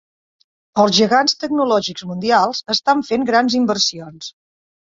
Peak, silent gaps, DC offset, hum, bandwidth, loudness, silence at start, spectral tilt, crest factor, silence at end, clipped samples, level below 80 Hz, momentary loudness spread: -2 dBFS; none; under 0.1%; none; 7.8 kHz; -16 LUFS; 0.75 s; -3.5 dB/octave; 16 dB; 0.65 s; under 0.1%; -60 dBFS; 13 LU